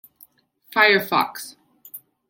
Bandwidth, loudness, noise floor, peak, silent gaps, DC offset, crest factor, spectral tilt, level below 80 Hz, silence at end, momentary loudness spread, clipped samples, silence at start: 17 kHz; -19 LUFS; -55 dBFS; -2 dBFS; none; under 0.1%; 22 dB; -3 dB/octave; -70 dBFS; 0.35 s; 24 LU; under 0.1%; 0.75 s